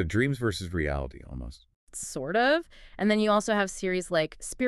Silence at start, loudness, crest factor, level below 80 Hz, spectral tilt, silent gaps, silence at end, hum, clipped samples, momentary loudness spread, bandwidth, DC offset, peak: 0 s; -28 LUFS; 18 dB; -44 dBFS; -5 dB/octave; 1.76-1.87 s; 0 s; none; under 0.1%; 17 LU; 13.5 kHz; under 0.1%; -10 dBFS